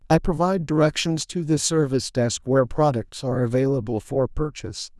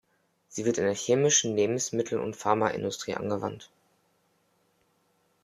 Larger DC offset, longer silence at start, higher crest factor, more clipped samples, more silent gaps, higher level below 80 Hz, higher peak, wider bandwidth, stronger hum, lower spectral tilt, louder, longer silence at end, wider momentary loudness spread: neither; second, 0.1 s vs 0.5 s; second, 16 dB vs 22 dB; neither; neither; first, -40 dBFS vs -70 dBFS; about the same, -6 dBFS vs -8 dBFS; second, 12 kHz vs 14 kHz; neither; first, -5.5 dB/octave vs -3.5 dB/octave; first, -23 LUFS vs -27 LUFS; second, 0.1 s vs 1.8 s; second, 7 LU vs 11 LU